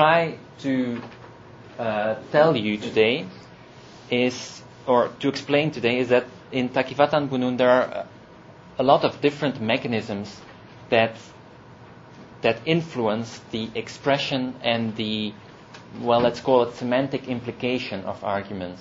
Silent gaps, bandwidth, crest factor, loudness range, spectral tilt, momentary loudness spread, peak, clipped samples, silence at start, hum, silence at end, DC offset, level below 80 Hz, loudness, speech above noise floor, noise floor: none; 7.8 kHz; 22 dB; 4 LU; -6 dB/octave; 15 LU; -2 dBFS; under 0.1%; 0 s; none; 0 s; under 0.1%; -60 dBFS; -23 LUFS; 23 dB; -46 dBFS